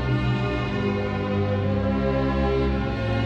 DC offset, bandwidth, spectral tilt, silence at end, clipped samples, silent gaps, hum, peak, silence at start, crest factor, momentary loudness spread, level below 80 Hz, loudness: under 0.1%; 7.6 kHz; -8.5 dB/octave; 0 s; under 0.1%; none; none; -12 dBFS; 0 s; 12 dB; 2 LU; -32 dBFS; -24 LUFS